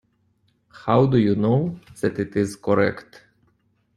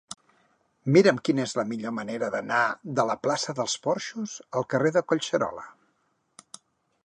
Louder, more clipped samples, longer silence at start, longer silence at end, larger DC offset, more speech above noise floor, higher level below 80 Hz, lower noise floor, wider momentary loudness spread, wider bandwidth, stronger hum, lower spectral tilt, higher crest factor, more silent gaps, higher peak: first, -21 LUFS vs -26 LUFS; neither; first, 0.75 s vs 0.1 s; second, 0.95 s vs 1.35 s; neither; about the same, 45 dB vs 46 dB; first, -56 dBFS vs -72 dBFS; second, -65 dBFS vs -72 dBFS; second, 11 LU vs 18 LU; first, 12.5 kHz vs 11 kHz; neither; first, -8 dB/octave vs -5 dB/octave; about the same, 18 dB vs 22 dB; neither; about the same, -4 dBFS vs -6 dBFS